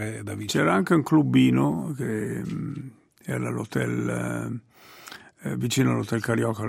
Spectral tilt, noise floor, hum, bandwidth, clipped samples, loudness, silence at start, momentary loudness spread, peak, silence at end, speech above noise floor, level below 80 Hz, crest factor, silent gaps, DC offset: -6 dB/octave; -46 dBFS; none; 16.5 kHz; under 0.1%; -25 LUFS; 0 s; 18 LU; -8 dBFS; 0 s; 21 dB; -60 dBFS; 18 dB; none; under 0.1%